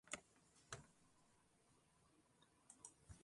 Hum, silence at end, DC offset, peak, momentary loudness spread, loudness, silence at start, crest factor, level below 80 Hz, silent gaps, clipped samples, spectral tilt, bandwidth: none; 0 s; under 0.1%; -30 dBFS; 7 LU; -59 LUFS; 0.05 s; 34 dB; -78 dBFS; none; under 0.1%; -2 dB/octave; 11.5 kHz